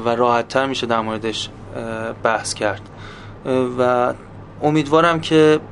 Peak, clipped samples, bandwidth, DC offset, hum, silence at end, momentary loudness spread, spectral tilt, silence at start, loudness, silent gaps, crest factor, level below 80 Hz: 0 dBFS; under 0.1%; 11.5 kHz; under 0.1%; none; 0 s; 17 LU; -5 dB/octave; 0 s; -19 LUFS; none; 18 dB; -48 dBFS